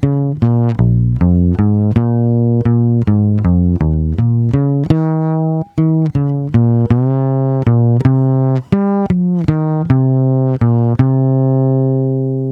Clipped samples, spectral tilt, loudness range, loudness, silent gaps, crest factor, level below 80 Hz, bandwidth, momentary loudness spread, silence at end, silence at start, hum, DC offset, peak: under 0.1%; -11.5 dB/octave; 1 LU; -13 LUFS; none; 12 dB; -30 dBFS; 4.1 kHz; 3 LU; 0 s; 0 s; none; under 0.1%; 0 dBFS